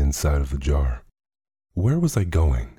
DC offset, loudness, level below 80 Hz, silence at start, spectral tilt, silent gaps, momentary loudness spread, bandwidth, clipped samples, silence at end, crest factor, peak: under 0.1%; -23 LUFS; -26 dBFS; 0 s; -6.5 dB/octave; none; 8 LU; 15.5 kHz; under 0.1%; 0.1 s; 14 dB; -8 dBFS